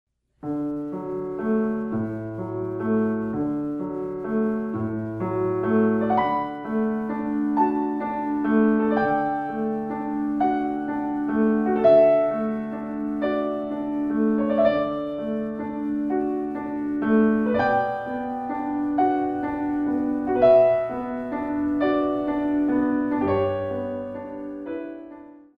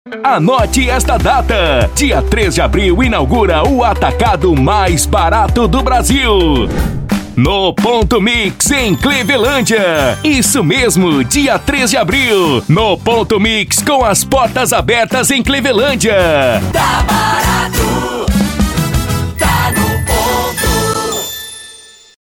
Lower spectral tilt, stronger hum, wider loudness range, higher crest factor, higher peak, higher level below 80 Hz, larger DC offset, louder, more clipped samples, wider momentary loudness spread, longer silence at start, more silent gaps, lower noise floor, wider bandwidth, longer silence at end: first, -9.5 dB/octave vs -4 dB/octave; neither; about the same, 5 LU vs 3 LU; first, 18 dB vs 10 dB; second, -6 dBFS vs 0 dBFS; second, -56 dBFS vs -20 dBFS; neither; second, -24 LUFS vs -11 LUFS; neither; first, 10 LU vs 4 LU; first, 0.45 s vs 0.05 s; neither; first, -44 dBFS vs -37 dBFS; second, 5.2 kHz vs 20 kHz; second, 0.25 s vs 0.45 s